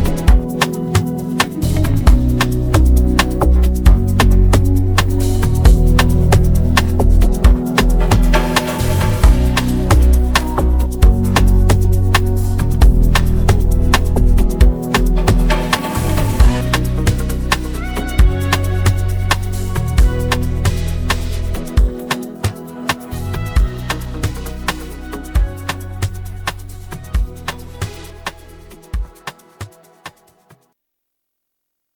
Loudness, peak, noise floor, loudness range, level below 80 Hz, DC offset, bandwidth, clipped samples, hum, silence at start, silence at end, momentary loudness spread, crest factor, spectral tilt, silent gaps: -16 LUFS; 0 dBFS; -75 dBFS; 13 LU; -16 dBFS; under 0.1%; 20 kHz; under 0.1%; none; 0 s; 1.85 s; 12 LU; 14 dB; -5.5 dB/octave; none